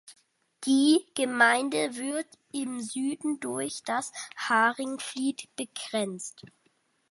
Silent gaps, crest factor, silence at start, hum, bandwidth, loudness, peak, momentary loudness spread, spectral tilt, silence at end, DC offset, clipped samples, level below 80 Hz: none; 22 dB; 0.05 s; none; 11.5 kHz; -28 LUFS; -8 dBFS; 14 LU; -2.5 dB/octave; 0.65 s; under 0.1%; under 0.1%; -80 dBFS